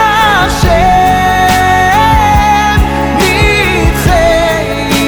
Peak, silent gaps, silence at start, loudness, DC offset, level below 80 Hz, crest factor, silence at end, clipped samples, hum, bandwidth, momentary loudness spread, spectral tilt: 0 dBFS; none; 0 s; -8 LUFS; under 0.1%; -18 dBFS; 8 dB; 0 s; under 0.1%; none; over 20 kHz; 3 LU; -4.5 dB/octave